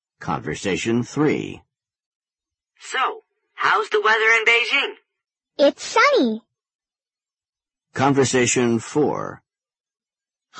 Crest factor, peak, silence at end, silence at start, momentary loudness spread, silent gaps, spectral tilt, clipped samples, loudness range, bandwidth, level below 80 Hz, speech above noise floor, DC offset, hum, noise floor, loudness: 18 dB; -4 dBFS; 0 s; 0.2 s; 14 LU; 2.06-2.20 s, 6.75-6.79 s; -3.5 dB/octave; under 0.1%; 7 LU; 8.8 kHz; -60 dBFS; over 71 dB; under 0.1%; none; under -90 dBFS; -19 LUFS